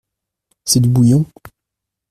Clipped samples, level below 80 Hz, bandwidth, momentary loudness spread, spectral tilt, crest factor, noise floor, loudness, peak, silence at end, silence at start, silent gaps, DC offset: under 0.1%; -48 dBFS; 14.5 kHz; 15 LU; -6 dB/octave; 16 dB; -81 dBFS; -13 LUFS; 0 dBFS; 0.85 s; 0.65 s; none; under 0.1%